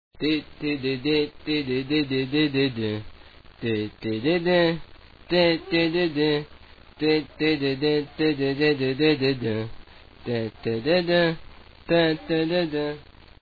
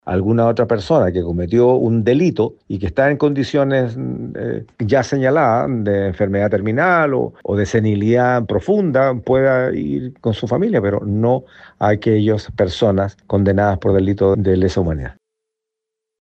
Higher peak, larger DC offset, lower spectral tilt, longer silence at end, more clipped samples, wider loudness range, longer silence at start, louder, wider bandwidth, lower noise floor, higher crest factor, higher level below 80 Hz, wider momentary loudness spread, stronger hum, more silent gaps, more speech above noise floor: second, -8 dBFS vs -2 dBFS; neither; about the same, -8 dB/octave vs -8 dB/octave; second, 0.4 s vs 1.1 s; neither; about the same, 2 LU vs 2 LU; about the same, 0.15 s vs 0.05 s; second, -24 LUFS vs -17 LUFS; second, 5 kHz vs 8.2 kHz; second, -47 dBFS vs -82 dBFS; about the same, 18 dB vs 14 dB; second, -50 dBFS vs -42 dBFS; about the same, 9 LU vs 7 LU; neither; neither; second, 24 dB vs 66 dB